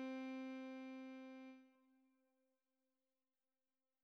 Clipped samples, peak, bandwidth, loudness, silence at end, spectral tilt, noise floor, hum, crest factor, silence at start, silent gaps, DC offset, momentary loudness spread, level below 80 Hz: under 0.1%; -40 dBFS; 6.4 kHz; -53 LUFS; 2.1 s; -2 dB/octave; under -90 dBFS; none; 16 dB; 0 s; none; under 0.1%; 12 LU; under -90 dBFS